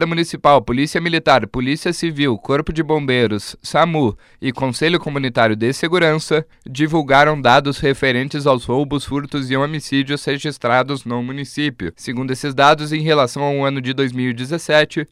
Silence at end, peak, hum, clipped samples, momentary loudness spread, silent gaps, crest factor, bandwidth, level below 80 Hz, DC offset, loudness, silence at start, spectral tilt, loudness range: 0.05 s; 0 dBFS; none; under 0.1%; 9 LU; none; 16 dB; 14.5 kHz; -44 dBFS; under 0.1%; -17 LUFS; 0 s; -5.5 dB/octave; 4 LU